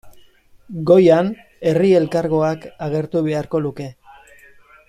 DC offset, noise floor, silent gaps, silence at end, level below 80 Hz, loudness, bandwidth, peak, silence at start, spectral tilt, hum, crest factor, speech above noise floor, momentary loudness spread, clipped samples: under 0.1%; -49 dBFS; none; 0.95 s; -54 dBFS; -17 LUFS; 11 kHz; -2 dBFS; 0.05 s; -8 dB/octave; none; 16 dB; 32 dB; 15 LU; under 0.1%